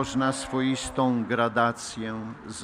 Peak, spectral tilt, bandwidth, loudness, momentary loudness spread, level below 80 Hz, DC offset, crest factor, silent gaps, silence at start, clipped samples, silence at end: -8 dBFS; -5 dB/octave; 14.5 kHz; -27 LUFS; 10 LU; -52 dBFS; under 0.1%; 18 dB; none; 0 s; under 0.1%; 0 s